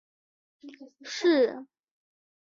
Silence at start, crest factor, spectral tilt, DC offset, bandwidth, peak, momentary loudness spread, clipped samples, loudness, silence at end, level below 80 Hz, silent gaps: 0.65 s; 18 dB; -3 dB/octave; under 0.1%; 7.6 kHz; -14 dBFS; 25 LU; under 0.1%; -26 LUFS; 0.85 s; -82 dBFS; none